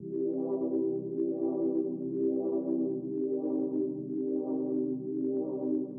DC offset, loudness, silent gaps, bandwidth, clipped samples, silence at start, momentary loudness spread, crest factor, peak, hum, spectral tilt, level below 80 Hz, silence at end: under 0.1%; -32 LUFS; none; 1.4 kHz; under 0.1%; 0 s; 3 LU; 12 dB; -20 dBFS; none; -12 dB/octave; -86 dBFS; 0 s